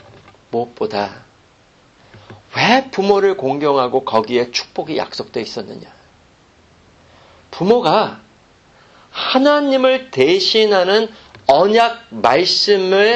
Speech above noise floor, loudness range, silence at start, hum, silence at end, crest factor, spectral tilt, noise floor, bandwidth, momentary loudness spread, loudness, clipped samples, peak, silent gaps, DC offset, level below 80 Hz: 36 dB; 8 LU; 0.5 s; none; 0 s; 16 dB; -4.5 dB/octave; -51 dBFS; 8.4 kHz; 12 LU; -15 LUFS; under 0.1%; 0 dBFS; none; under 0.1%; -56 dBFS